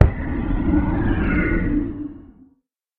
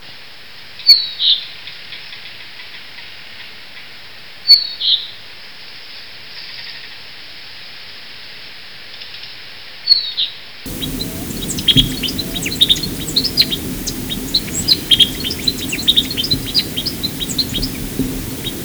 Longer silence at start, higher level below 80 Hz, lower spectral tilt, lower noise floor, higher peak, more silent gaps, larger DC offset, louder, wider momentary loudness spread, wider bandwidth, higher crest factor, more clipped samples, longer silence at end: about the same, 0 s vs 0 s; first, -26 dBFS vs -36 dBFS; first, -8.5 dB/octave vs -2.5 dB/octave; first, -64 dBFS vs -38 dBFS; about the same, 0 dBFS vs 0 dBFS; neither; second, under 0.1% vs 1%; second, -22 LUFS vs -14 LUFS; second, 9 LU vs 22 LU; second, 4.2 kHz vs over 20 kHz; about the same, 20 dB vs 20 dB; neither; first, 0.75 s vs 0 s